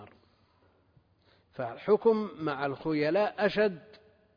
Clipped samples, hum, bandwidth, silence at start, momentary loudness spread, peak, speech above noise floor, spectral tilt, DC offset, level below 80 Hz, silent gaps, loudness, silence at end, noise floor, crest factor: under 0.1%; none; 5.2 kHz; 0 s; 14 LU; -14 dBFS; 38 dB; -4.5 dB/octave; under 0.1%; -68 dBFS; none; -29 LUFS; 0.4 s; -67 dBFS; 18 dB